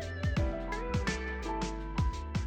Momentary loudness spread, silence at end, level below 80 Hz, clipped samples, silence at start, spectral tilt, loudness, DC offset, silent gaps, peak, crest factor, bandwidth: 4 LU; 0 s; -38 dBFS; under 0.1%; 0 s; -6 dB/octave; -35 LUFS; under 0.1%; none; -22 dBFS; 10 dB; 9.6 kHz